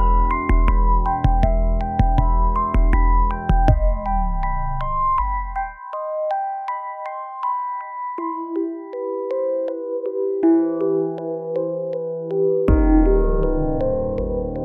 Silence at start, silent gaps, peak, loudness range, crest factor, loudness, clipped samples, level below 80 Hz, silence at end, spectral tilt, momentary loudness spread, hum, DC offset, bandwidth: 0 s; none; -2 dBFS; 6 LU; 16 dB; -21 LUFS; under 0.1%; -22 dBFS; 0 s; -10.5 dB/octave; 10 LU; none; under 0.1%; 3.7 kHz